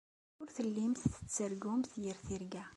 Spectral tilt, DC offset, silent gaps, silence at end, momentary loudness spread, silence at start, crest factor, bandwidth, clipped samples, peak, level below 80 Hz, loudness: -5.5 dB/octave; under 0.1%; none; 0 s; 8 LU; 0.4 s; 20 dB; 11.5 kHz; under 0.1%; -18 dBFS; -60 dBFS; -39 LUFS